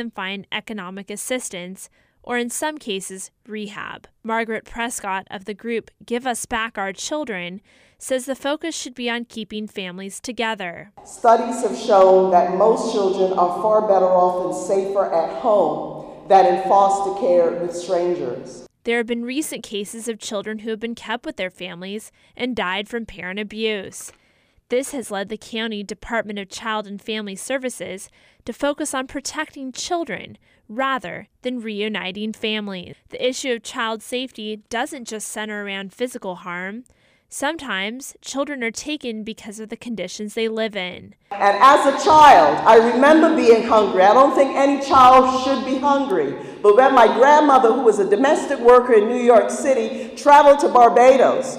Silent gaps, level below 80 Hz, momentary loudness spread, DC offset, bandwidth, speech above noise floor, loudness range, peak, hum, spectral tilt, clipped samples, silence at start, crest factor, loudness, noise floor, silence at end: none; -56 dBFS; 19 LU; under 0.1%; 15.5 kHz; 41 dB; 14 LU; -2 dBFS; none; -3.5 dB/octave; under 0.1%; 0 s; 16 dB; -18 LUFS; -60 dBFS; 0 s